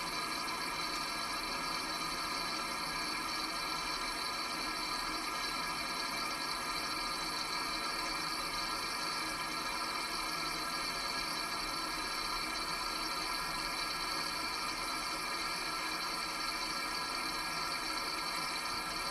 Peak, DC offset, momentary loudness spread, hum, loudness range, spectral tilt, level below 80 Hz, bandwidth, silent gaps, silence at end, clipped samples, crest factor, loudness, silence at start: -24 dBFS; under 0.1%; 1 LU; none; 0 LU; -1 dB/octave; -58 dBFS; 16 kHz; none; 0 s; under 0.1%; 14 dB; -36 LUFS; 0 s